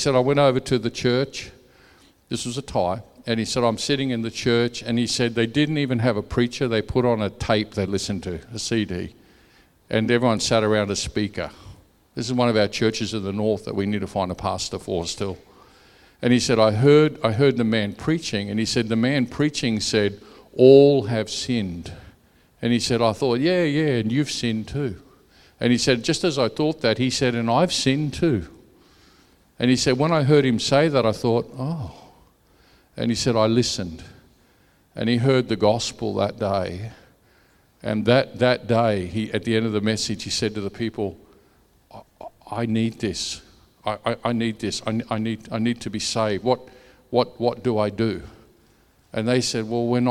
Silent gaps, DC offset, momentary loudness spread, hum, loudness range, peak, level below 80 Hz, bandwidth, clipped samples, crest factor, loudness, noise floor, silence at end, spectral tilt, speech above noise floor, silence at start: none; under 0.1%; 11 LU; none; 6 LU; 0 dBFS; -50 dBFS; 13.5 kHz; under 0.1%; 22 dB; -22 LUFS; -59 dBFS; 0 s; -5 dB/octave; 37 dB; 0 s